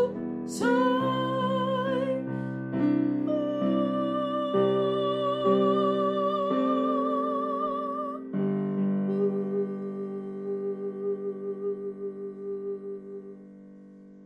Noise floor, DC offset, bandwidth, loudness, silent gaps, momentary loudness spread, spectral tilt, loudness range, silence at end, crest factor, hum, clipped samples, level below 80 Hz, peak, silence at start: -49 dBFS; under 0.1%; 11.5 kHz; -28 LUFS; none; 11 LU; -7 dB/octave; 8 LU; 0 s; 16 dB; none; under 0.1%; -70 dBFS; -12 dBFS; 0 s